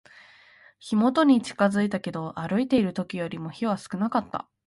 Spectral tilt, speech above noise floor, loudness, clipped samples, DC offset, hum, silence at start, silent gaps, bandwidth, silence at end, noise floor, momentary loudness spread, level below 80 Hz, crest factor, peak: -6.5 dB/octave; 30 dB; -25 LUFS; under 0.1%; under 0.1%; none; 0.85 s; none; 11.5 kHz; 0.25 s; -55 dBFS; 12 LU; -62 dBFS; 18 dB; -8 dBFS